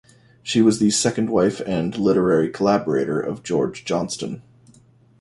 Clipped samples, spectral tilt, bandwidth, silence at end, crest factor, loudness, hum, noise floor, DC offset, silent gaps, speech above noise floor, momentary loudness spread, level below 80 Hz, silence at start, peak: under 0.1%; -5 dB/octave; 11.5 kHz; 0.8 s; 16 dB; -20 LUFS; none; -53 dBFS; under 0.1%; none; 33 dB; 10 LU; -54 dBFS; 0.45 s; -4 dBFS